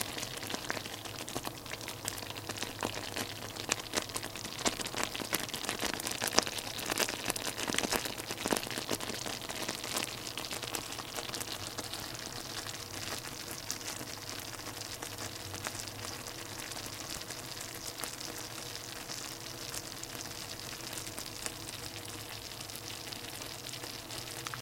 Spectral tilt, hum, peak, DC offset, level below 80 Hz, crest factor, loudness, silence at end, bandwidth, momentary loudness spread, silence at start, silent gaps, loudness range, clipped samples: -2 dB/octave; none; 0 dBFS; under 0.1%; -60 dBFS; 40 dB; -37 LUFS; 0 s; 17 kHz; 8 LU; 0 s; none; 7 LU; under 0.1%